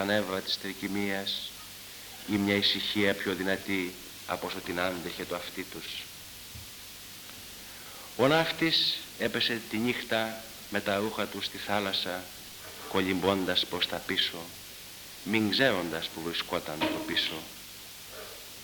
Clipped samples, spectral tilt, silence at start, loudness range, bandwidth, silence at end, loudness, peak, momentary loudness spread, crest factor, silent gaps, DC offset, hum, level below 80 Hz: under 0.1%; -3.5 dB/octave; 0 s; 7 LU; 19 kHz; 0 s; -30 LUFS; -10 dBFS; 17 LU; 22 dB; none; under 0.1%; none; -62 dBFS